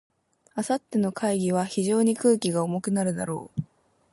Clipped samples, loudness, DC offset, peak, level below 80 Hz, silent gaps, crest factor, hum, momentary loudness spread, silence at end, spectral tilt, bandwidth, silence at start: under 0.1%; -26 LUFS; under 0.1%; -10 dBFS; -66 dBFS; none; 16 dB; none; 12 LU; 0.5 s; -5.5 dB/octave; 11.5 kHz; 0.55 s